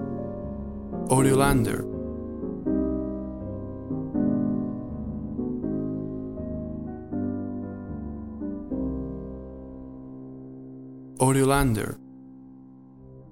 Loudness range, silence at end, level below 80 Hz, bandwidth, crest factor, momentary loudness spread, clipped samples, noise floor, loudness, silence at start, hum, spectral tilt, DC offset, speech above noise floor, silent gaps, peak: 8 LU; 0 s; -42 dBFS; 16.5 kHz; 22 dB; 20 LU; under 0.1%; -48 dBFS; -28 LUFS; 0 s; none; -6 dB/octave; 0.2%; 26 dB; none; -6 dBFS